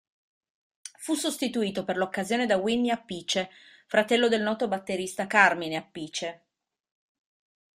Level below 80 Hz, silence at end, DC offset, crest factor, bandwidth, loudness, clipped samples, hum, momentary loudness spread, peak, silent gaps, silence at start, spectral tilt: -70 dBFS; 1.4 s; under 0.1%; 24 dB; 15.5 kHz; -27 LUFS; under 0.1%; none; 13 LU; -4 dBFS; none; 0.85 s; -3.5 dB/octave